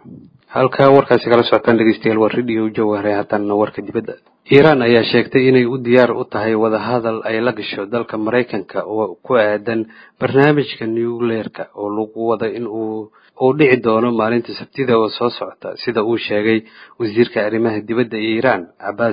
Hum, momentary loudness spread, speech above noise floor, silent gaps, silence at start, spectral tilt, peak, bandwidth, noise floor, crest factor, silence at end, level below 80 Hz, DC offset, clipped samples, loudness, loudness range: none; 11 LU; 24 dB; none; 0.05 s; -9 dB/octave; 0 dBFS; 5.2 kHz; -40 dBFS; 16 dB; 0 s; -56 dBFS; under 0.1%; under 0.1%; -16 LUFS; 5 LU